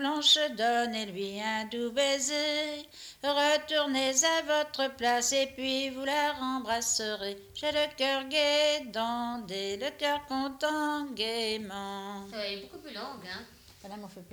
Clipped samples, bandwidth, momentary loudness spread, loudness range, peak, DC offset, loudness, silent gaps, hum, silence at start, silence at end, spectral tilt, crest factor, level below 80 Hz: under 0.1%; over 20 kHz; 15 LU; 6 LU; -14 dBFS; under 0.1%; -29 LUFS; none; none; 0 s; 0 s; -1 dB/octave; 18 dB; -66 dBFS